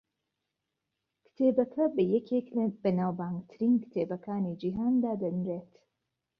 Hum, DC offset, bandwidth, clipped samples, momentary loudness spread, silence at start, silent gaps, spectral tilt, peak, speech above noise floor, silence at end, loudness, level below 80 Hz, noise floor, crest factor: none; under 0.1%; 5.2 kHz; under 0.1%; 7 LU; 1.4 s; none; -11 dB/octave; -14 dBFS; 56 dB; 0.75 s; -30 LUFS; -70 dBFS; -85 dBFS; 18 dB